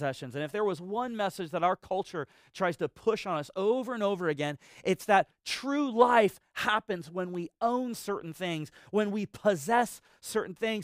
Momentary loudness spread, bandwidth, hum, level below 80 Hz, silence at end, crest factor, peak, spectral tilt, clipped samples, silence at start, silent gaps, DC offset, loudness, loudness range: 10 LU; 16 kHz; none; -70 dBFS; 0 s; 22 dB; -8 dBFS; -5 dB/octave; under 0.1%; 0 s; none; under 0.1%; -30 LUFS; 4 LU